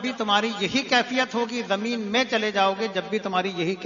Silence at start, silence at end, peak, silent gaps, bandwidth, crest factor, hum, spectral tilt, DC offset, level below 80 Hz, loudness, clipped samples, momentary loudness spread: 0 s; 0 s; -6 dBFS; none; 7.4 kHz; 20 dB; none; -3.5 dB/octave; under 0.1%; -66 dBFS; -24 LUFS; under 0.1%; 5 LU